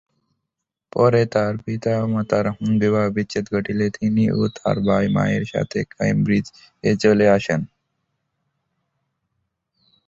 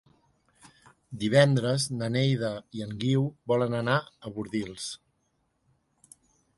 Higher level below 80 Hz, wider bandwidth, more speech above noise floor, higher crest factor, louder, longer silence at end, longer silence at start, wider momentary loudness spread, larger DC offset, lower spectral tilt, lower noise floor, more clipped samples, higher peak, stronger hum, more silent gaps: first, -50 dBFS vs -64 dBFS; second, 7.8 kHz vs 11.5 kHz; first, 63 dB vs 47 dB; about the same, 18 dB vs 20 dB; first, -20 LUFS vs -28 LUFS; first, 2.4 s vs 1.6 s; second, 0.95 s vs 1.1 s; second, 8 LU vs 15 LU; neither; first, -7.5 dB/octave vs -5.5 dB/octave; first, -82 dBFS vs -74 dBFS; neither; first, -2 dBFS vs -8 dBFS; neither; neither